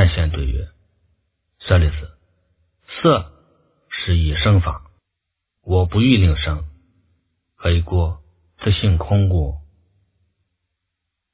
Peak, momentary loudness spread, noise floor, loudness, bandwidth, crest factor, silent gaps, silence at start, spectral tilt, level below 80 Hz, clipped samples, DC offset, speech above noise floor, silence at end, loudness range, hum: 0 dBFS; 20 LU; -79 dBFS; -19 LUFS; 4 kHz; 20 dB; none; 0 s; -11 dB/octave; -26 dBFS; under 0.1%; under 0.1%; 63 dB; 1.7 s; 3 LU; none